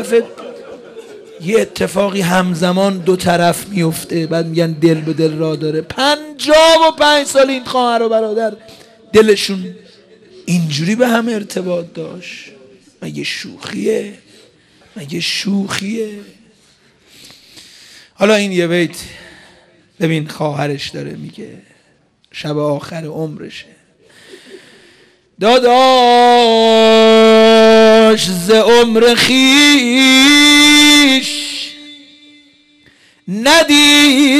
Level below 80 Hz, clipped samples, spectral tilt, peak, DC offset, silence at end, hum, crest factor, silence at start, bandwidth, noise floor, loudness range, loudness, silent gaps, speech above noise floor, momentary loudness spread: -50 dBFS; under 0.1%; -3.5 dB/octave; 0 dBFS; under 0.1%; 0 s; none; 12 dB; 0 s; 15 kHz; -55 dBFS; 15 LU; -11 LUFS; none; 42 dB; 20 LU